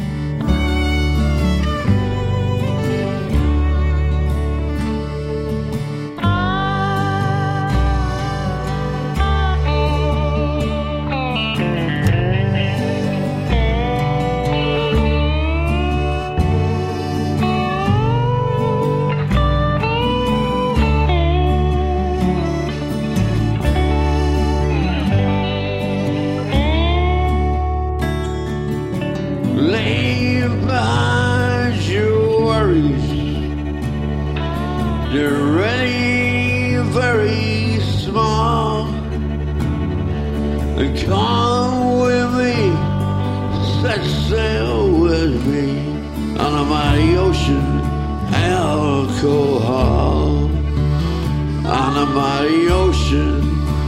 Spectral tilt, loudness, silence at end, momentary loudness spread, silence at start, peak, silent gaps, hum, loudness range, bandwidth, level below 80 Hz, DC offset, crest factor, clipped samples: -7 dB/octave; -18 LUFS; 0 s; 6 LU; 0 s; -2 dBFS; none; none; 2 LU; 12.5 kHz; -24 dBFS; under 0.1%; 14 dB; under 0.1%